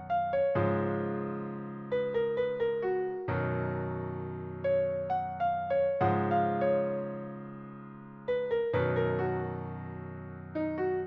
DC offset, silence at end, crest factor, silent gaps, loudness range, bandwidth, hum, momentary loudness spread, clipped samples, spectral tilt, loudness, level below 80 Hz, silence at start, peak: under 0.1%; 0 s; 16 dB; none; 3 LU; 5.6 kHz; none; 13 LU; under 0.1%; -7 dB/octave; -32 LUFS; -64 dBFS; 0 s; -16 dBFS